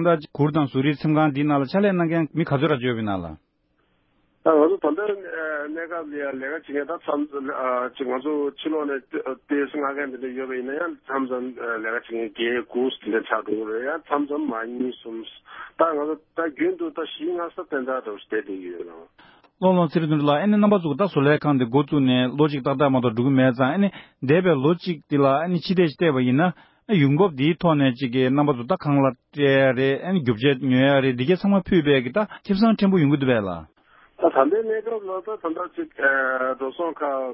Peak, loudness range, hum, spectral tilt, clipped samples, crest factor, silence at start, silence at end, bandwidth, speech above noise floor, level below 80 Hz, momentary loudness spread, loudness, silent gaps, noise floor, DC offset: -4 dBFS; 7 LU; none; -11.5 dB/octave; under 0.1%; 18 dB; 0 s; 0 s; 5.8 kHz; 45 dB; -58 dBFS; 11 LU; -22 LUFS; none; -67 dBFS; under 0.1%